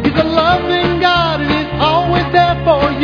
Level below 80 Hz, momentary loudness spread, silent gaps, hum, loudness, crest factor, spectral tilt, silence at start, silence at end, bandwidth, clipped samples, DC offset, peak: -30 dBFS; 2 LU; none; none; -13 LUFS; 12 dB; -7 dB/octave; 0 s; 0 s; 5.4 kHz; under 0.1%; under 0.1%; 0 dBFS